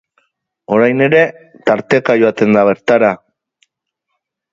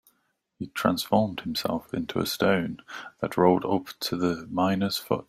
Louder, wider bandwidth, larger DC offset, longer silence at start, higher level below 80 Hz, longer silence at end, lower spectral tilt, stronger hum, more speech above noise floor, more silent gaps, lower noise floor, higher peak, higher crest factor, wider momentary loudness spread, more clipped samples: first, -12 LUFS vs -26 LUFS; second, 7.4 kHz vs 16 kHz; neither; about the same, 0.7 s vs 0.6 s; about the same, -58 dBFS vs -62 dBFS; first, 1.35 s vs 0.05 s; first, -7 dB/octave vs -5.5 dB/octave; neither; first, 62 dB vs 47 dB; neither; about the same, -74 dBFS vs -73 dBFS; first, 0 dBFS vs -4 dBFS; second, 14 dB vs 22 dB; second, 6 LU vs 12 LU; neither